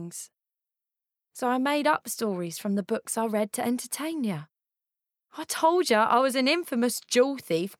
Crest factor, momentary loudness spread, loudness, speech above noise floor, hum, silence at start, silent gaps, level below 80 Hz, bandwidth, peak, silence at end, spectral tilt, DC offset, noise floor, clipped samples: 18 dB; 11 LU; -26 LUFS; 61 dB; none; 0 s; none; -84 dBFS; 18 kHz; -10 dBFS; 0.05 s; -3.5 dB/octave; under 0.1%; -87 dBFS; under 0.1%